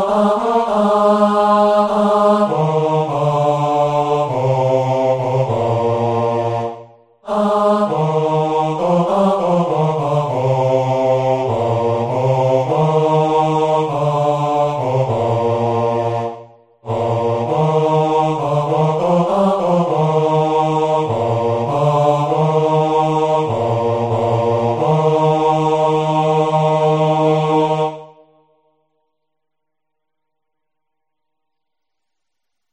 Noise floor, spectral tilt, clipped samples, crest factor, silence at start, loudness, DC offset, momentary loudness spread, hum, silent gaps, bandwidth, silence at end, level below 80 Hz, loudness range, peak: -80 dBFS; -7.5 dB/octave; under 0.1%; 14 dB; 0 s; -16 LUFS; under 0.1%; 4 LU; none; none; 10 kHz; 4.65 s; -52 dBFS; 3 LU; -2 dBFS